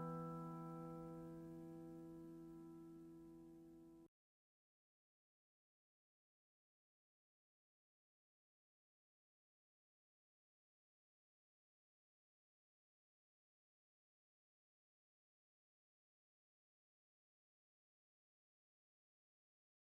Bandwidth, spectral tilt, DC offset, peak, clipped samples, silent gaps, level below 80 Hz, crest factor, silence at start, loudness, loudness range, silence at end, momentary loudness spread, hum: 15.5 kHz; -8.5 dB/octave; under 0.1%; -40 dBFS; under 0.1%; none; -84 dBFS; 22 dB; 0 s; -56 LUFS; 12 LU; 15.9 s; 12 LU; 50 Hz at -90 dBFS